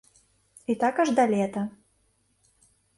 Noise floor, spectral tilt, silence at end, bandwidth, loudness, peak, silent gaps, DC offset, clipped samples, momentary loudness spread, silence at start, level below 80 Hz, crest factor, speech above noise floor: -69 dBFS; -6 dB/octave; 1.3 s; 11.5 kHz; -25 LUFS; -10 dBFS; none; under 0.1%; under 0.1%; 13 LU; 0.7 s; -70 dBFS; 20 dB; 45 dB